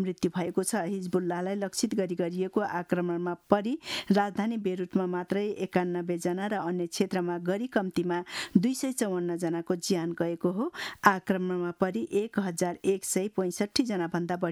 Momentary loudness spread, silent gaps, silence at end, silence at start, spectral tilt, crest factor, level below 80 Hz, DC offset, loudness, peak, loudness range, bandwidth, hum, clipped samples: 5 LU; none; 0 s; 0 s; -5 dB/octave; 24 dB; -68 dBFS; under 0.1%; -30 LUFS; -4 dBFS; 2 LU; 15.5 kHz; none; under 0.1%